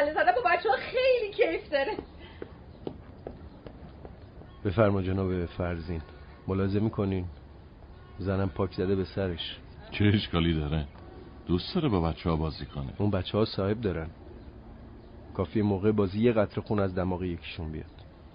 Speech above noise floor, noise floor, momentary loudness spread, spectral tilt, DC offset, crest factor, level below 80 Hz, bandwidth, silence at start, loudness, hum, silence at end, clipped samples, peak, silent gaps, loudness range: 20 dB; -49 dBFS; 22 LU; -5.5 dB/octave; under 0.1%; 20 dB; -46 dBFS; 5.2 kHz; 0 s; -29 LUFS; none; 0.05 s; under 0.1%; -10 dBFS; none; 3 LU